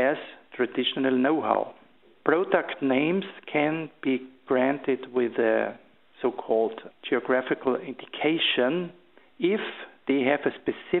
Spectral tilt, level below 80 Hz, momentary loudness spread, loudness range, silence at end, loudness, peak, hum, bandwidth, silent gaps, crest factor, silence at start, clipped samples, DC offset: -3 dB/octave; -72 dBFS; 8 LU; 1 LU; 0 s; -26 LUFS; -6 dBFS; none; 4.2 kHz; none; 22 dB; 0 s; under 0.1%; under 0.1%